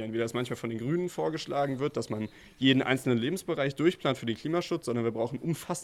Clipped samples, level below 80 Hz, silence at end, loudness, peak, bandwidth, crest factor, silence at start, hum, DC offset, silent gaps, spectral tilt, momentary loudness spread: under 0.1%; -64 dBFS; 0 s; -30 LUFS; -10 dBFS; 15.5 kHz; 20 dB; 0 s; none; under 0.1%; none; -5.5 dB/octave; 8 LU